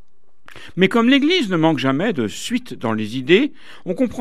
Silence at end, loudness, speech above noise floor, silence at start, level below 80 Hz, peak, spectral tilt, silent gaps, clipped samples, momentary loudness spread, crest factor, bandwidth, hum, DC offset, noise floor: 0 s; -18 LUFS; 34 dB; 0.55 s; -58 dBFS; 0 dBFS; -5.5 dB/octave; none; under 0.1%; 10 LU; 18 dB; 14 kHz; none; 2%; -52 dBFS